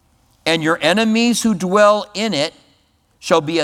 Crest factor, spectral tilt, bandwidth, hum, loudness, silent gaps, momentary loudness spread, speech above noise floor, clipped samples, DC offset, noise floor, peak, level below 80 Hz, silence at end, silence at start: 16 dB; -4 dB/octave; 15.5 kHz; none; -16 LUFS; none; 9 LU; 43 dB; under 0.1%; under 0.1%; -58 dBFS; 0 dBFS; -56 dBFS; 0 s; 0.45 s